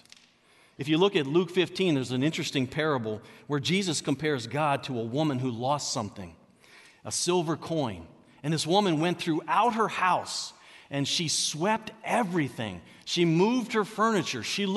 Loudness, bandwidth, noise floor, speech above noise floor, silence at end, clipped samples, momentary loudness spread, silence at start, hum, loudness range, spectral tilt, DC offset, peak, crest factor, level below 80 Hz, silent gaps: -28 LUFS; 12 kHz; -61 dBFS; 33 dB; 0 s; under 0.1%; 11 LU; 0.8 s; none; 3 LU; -4.5 dB/octave; under 0.1%; -10 dBFS; 18 dB; -68 dBFS; none